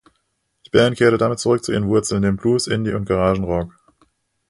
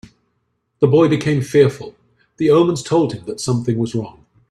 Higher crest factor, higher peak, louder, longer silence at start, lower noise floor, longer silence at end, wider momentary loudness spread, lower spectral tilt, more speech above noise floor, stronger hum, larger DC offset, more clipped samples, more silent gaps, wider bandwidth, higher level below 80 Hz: about the same, 18 dB vs 18 dB; about the same, 0 dBFS vs 0 dBFS; about the same, -18 LUFS vs -17 LUFS; about the same, 0.75 s vs 0.8 s; about the same, -70 dBFS vs -69 dBFS; first, 0.8 s vs 0.4 s; second, 6 LU vs 12 LU; about the same, -5.5 dB/octave vs -6.5 dB/octave; about the same, 52 dB vs 53 dB; neither; neither; neither; neither; about the same, 11.5 kHz vs 12.5 kHz; first, -42 dBFS vs -54 dBFS